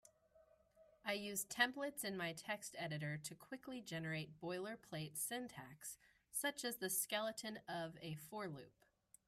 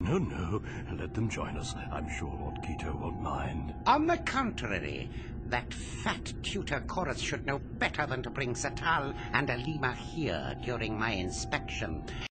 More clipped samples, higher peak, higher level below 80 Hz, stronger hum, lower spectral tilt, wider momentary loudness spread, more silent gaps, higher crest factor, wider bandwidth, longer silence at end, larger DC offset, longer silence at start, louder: neither; second, -22 dBFS vs -10 dBFS; second, -82 dBFS vs -44 dBFS; neither; second, -3 dB/octave vs -5 dB/octave; first, 12 LU vs 8 LU; neither; about the same, 26 dB vs 22 dB; first, 15.5 kHz vs 8.8 kHz; first, 0.55 s vs 0.05 s; neither; about the same, 0.05 s vs 0 s; second, -45 LUFS vs -34 LUFS